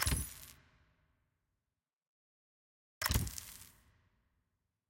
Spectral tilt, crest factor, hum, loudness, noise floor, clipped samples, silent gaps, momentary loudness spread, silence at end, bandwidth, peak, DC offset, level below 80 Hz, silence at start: -3 dB/octave; 26 dB; none; -38 LUFS; under -90 dBFS; under 0.1%; 2.07-3.01 s; 20 LU; 1.2 s; 17 kHz; -18 dBFS; under 0.1%; -50 dBFS; 0 s